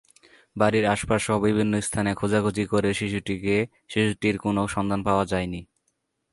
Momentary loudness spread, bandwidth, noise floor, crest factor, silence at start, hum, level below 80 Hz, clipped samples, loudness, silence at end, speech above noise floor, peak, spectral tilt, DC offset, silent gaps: 6 LU; 11.5 kHz; -75 dBFS; 20 dB; 0.55 s; none; -48 dBFS; under 0.1%; -24 LUFS; 0.7 s; 51 dB; -6 dBFS; -5.5 dB/octave; under 0.1%; none